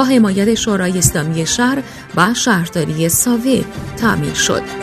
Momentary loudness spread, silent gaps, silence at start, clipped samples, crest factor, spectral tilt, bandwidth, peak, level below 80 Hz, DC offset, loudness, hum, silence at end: 6 LU; none; 0 s; under 0.1%; 14 dB; -4 dB/octave; 14 kHz; 0 dBFS; -38 dBFS; under 0.1%; -15 LUFS; none; 0 s